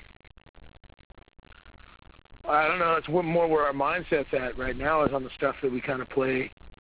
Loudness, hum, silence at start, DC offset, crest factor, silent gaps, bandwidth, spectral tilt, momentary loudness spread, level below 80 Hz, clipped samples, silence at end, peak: -27 LUFS; none; 0 s; under 0.1%; 18 dB; 0.49-0.54 s, 1.05-1.10 s, 6.53-6.57 s; 4 kHz; -9.5 dB/octave; 7 LU; -50 dBFS; under 0.1%; 0.15 s; -10 dBFS